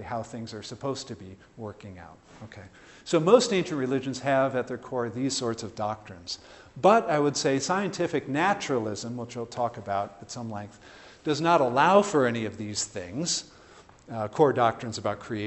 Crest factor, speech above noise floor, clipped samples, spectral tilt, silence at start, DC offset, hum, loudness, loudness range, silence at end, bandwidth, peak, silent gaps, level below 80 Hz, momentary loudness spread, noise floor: 22 dB; 26 dB; under 0.1%; -4.5 dB/octave; 0 s; under 0.1%; none; -26 LUFS; 4 LU; 0 s; 8.4 kHz; -6 dBFS; none; -64 dBFS; 20 LU; -53 dBFS